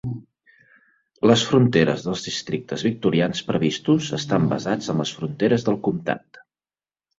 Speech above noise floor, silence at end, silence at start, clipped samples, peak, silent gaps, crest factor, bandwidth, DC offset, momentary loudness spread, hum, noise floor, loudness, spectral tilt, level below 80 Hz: over 69 dB; 1 s; 0.05 s; under 0.1%; -2 dBFS; none; 20 dB; 7.8 kHz; under 0.1%; 10 LU; none; under -90 dBFS; -22 LUFS; -5.5 dB/octave; -56 dBFS